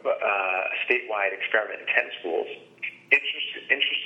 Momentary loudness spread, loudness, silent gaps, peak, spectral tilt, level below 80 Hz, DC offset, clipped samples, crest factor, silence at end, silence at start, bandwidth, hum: 11 LU; -24 LUFS; none; -4 dBFS; -3 dB/octave; -88 dBFS; under 0.1%; under 0.1%; 24 dB; 0 s; 0.05 s; 8.6 kHz; none